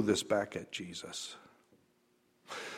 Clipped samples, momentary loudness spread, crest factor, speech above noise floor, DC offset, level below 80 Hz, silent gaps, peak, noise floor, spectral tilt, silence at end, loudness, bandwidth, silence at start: under 0.1%; 15 LU; 22 dB; 36 dB; under 0.1%; -74 dBFS; none; -16 dBFS; -72 dBFS; -3.5 dB/octave; 0 s; -37 LUFS; 16 kHz; 0 s